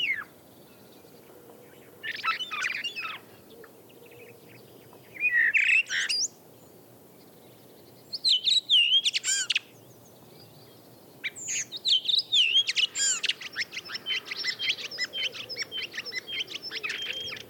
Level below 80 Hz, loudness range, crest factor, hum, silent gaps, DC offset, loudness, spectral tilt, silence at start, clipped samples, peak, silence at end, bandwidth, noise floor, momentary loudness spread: -82 dBFS; 10 LU; 18 dB; none; none; under 0.1%; -25 LUFS; 1.5 dB/octave; 0 s; under 0.1%; -14 dBFS; 0 s; 19 kHz; -53 dBFS; 14 LU